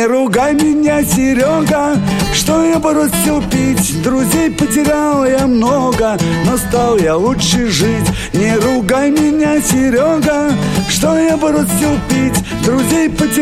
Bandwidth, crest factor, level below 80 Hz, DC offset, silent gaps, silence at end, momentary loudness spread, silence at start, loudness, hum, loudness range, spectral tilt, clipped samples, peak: 16.5 kHz; 12 dB; -30 dBFS; under 0.1%; none; 0 s; 2 LU; 0 s; -12 LUFS; none; 1 LU; -5 dB/octave; under 0.1%; 0 dBFS